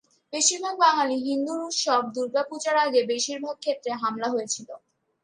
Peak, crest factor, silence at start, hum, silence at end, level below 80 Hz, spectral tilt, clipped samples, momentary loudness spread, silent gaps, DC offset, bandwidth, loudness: -6 dBFS; 18 dB; 0.3 s; none; 0.45 s; -80 dBFS; -1 dB/octave; under 0.1%; 9 LU; none; under 0.1%; 11 kHz; -25 LUFS